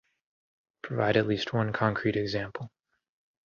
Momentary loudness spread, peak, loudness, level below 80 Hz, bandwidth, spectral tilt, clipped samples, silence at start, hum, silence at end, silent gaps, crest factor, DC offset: 16 LU; -10 dBFS; -29 LUFS; -60 dBFS; 7 kHz; -7 dB/octave; under 0.1%; 0.85 s; none; 0.75 s; none; 22 dB; under 0.1%